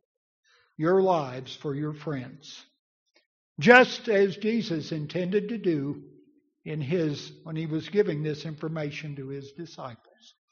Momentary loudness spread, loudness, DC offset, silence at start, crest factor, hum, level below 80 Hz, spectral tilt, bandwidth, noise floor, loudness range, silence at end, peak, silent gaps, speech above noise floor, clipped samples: 19 LU; -26 LUFS; under 0.1%; 0.8 s; 24 dB; none; -70 dBFS; -4.5 dB/octave; 7 kHz; -61 dBFS; 7 LU; 0.55 s; -2 dBFS; 2.79-3.06 s, 3.26-3.56 s; 35 dB; under 0.1%